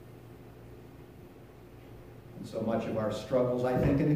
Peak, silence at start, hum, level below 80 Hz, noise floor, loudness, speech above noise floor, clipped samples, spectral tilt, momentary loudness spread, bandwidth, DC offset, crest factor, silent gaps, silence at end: -16 dBFS; 0 s; none; -52 dBFS; -51 dBFS; -31 LUFS; 22 dB; under 0.1%; -8 dB/octave; 23 LU; 15.5 kHz; under 0.1%; 16 dB; none; 0 s